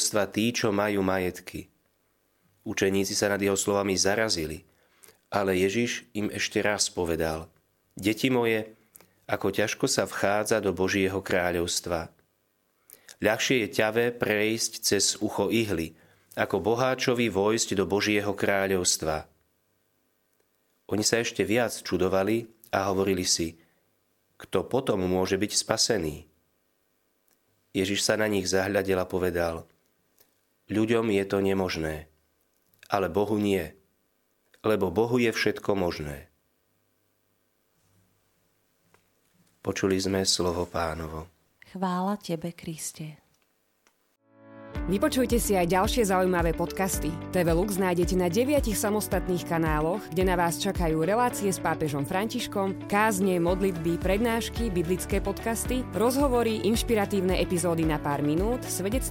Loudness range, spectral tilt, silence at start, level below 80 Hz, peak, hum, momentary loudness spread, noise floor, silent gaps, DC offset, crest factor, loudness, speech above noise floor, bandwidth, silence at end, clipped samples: 4 LU; -4 dB/octave; 0 s; -44 dBFS; -4 dBFS; none; 9 LU; -72 dBFS; none; under 0.1%; 24 dB; -26 LUFS; 46 dB; 17 kHz; 0 s; under 0.1%